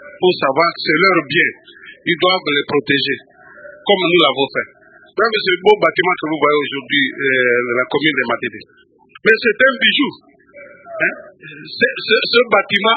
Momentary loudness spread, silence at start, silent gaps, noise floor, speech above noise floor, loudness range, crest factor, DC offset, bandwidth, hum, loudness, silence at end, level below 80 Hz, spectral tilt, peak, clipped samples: 11 LU; 0 s; none; -41 dBFS; 25 dB; 2 LU; 16 dB; under 0.1%; 6 kHz; none; -15 LUFS; 0 s; -62 dBFS; -6.5 dB/octave; 0 dBFS; under 0.1%